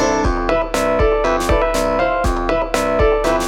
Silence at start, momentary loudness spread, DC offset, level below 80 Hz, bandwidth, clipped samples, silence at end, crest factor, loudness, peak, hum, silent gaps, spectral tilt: 0 s; 3 LU; under 0.1%; -24 dBFS; 17 kHz; under 0.1%; 0 s; 14 dB; -17 LUFS; -2 dBFS; none; none; -5 dB/octave